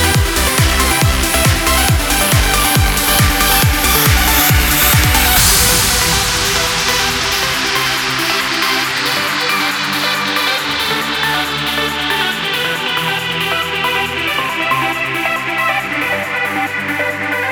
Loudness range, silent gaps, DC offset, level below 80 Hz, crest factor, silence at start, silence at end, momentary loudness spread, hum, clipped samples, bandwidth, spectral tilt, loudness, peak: 5 LU; none; under 0.1%; -24 dBFS; 14 dB; 0 s; 0 s; 6 LU; none; under 0.1%; over 20 kHz; -2.5 dB/octave; -13 LUFS; 0 dBFS